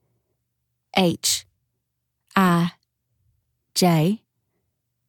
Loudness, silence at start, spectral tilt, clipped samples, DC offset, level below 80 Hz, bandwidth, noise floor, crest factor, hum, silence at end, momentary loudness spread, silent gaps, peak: -21 LUFS; 0.95 s; -4.5 dB/octave; under 0.1%; under 0.1%; -62 dBFS; 18.5 kHz; -77 dBFS; 20 dB; none; 0.9 s; 8 LU; none; -4 dBFS